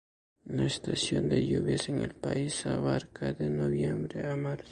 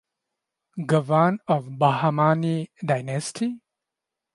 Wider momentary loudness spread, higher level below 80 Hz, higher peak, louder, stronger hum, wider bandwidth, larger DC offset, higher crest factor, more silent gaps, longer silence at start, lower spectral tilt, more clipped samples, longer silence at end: second, 6 LU vs 9 LU; first, -54 dBFS vs -70 dBFS; second, -14 dBFS vs -6 dBFS; second, -31 LUFS vs -23 LUFS; neither; about the same, 11.5 kHz vs 11.5 kHz; neither; about the same, 16 dB vs 20 dB; neither; second, 0.45 s vs 0.75 s; about the same, -5.5 dB/octave vs -6.5 dB/octave; neither; second, 0 s vs 0.75 s